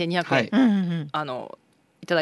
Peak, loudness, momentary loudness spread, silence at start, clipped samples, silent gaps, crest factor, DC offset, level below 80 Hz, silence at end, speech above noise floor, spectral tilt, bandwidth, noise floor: -6 dBFS; -23 LUFS; 14 LU; 0 s; under 0.1%; none; 18 dB; under 0.1%; -72 dBFS; 0 s; 25 dB; -6.5 dB/octave; 11.5 kHz; -48 dBFS